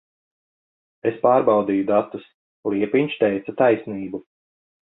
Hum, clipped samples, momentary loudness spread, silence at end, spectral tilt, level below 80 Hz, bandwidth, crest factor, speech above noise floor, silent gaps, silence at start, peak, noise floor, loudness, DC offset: none; under 0.1%; 15 LU; 0.75 s; -10.5 dB/octave; -64 dBFS; 4 kHz; 18 dB; over 70 dB; 2.34-2.63 s; 1.05 s; -4 dBFS; under -90 dBFS; -21 LUFS; under 0.1%